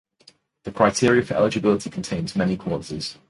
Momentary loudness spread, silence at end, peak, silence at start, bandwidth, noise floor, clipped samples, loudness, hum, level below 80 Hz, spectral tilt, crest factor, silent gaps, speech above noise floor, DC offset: 11 LU; 0.15 s; -2 dBFS; 0.65 s; 11.5 kHz; -56 dBFS; under 0.1%; -22 LUFS; none; -50 dBFS; -5.5 dB/octave; 22 dB; none; 34 dB; under 0.1%